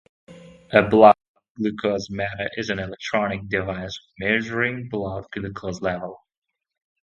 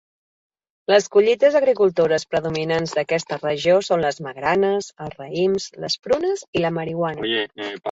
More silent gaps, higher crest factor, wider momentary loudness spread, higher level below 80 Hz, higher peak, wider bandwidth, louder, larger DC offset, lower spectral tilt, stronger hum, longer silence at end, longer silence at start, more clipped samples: first, 1.28-1.35 s, 1.50-1.55 s vs 6.48-6.53 s; first, 24 dB vs 18 dB; first, 16 LU vs 9 LU; first, -52 dBFS vs -58 dBFS; first, 0 dBFS vs -4 dBFS; about the same, 7.6 kHz vs 8 kHz; about the same, -22 LUFS vs -20 LUFS; neither; first, -6 dB/octave vs -4.5 dB/octave; neither; first, 0.85 s vs 0 s; second, 0.3 s vs 0.9 s; neither